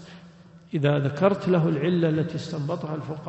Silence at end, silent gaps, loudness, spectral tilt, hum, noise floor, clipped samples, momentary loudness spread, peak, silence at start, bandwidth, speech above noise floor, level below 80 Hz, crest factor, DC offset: 0 s; none; -25 LUFS; -8 dB/octave; none; -49 dBFS; under 0.1%; 9 LU; -6 dBFS; 0 s; 8.2 kHz; 25 dB; -62 dBFS; 18 dB; under 0.1%